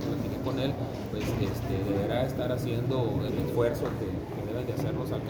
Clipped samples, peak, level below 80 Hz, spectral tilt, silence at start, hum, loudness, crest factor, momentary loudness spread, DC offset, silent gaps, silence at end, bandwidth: under 0.1%; -14 dBFS; -46 dBFS; -7.5 dB/octave; 0 s; none; -31 LUFS; 16 dB; 6 LU; under 0.1%; none; 0 s; over 20 kHz